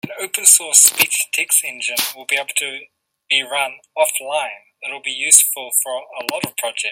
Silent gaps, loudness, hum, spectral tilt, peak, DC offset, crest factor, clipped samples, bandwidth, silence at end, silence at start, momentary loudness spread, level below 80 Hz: none; -15 LUFS; none; 1 dB/octave; 0 dBFS; under 0.1%; 18 dB; 0.1%; over 20 kHz; 0 s; 0.05 s; 15 LU; -74 dBFS